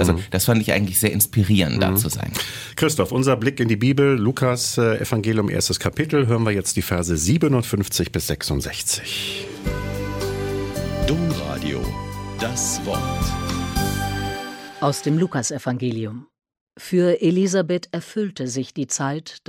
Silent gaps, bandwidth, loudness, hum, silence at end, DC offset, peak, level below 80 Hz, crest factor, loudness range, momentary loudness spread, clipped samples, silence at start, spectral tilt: 16.61-16.67 s; 17 kHz; -21 LUFS; none; 0.1 s; under 0.1%; -2 dBFS; -38 dBFS; 20 dB; 5 LU; 9 LU; under 0.1%; 0 s; -5 dB/octave